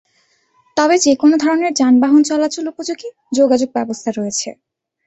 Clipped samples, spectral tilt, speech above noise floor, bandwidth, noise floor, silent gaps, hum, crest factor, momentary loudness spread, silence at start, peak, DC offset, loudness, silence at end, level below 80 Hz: under 0.1%; -3 dB/octave; 45 dB; 8.2 kHz; -60 dBFS; none; none; 14 dB; 12 LU; 0.75 s; -2 dBFS; under 0.1%; -15 LUFS; 0.55 s; -62 dBFS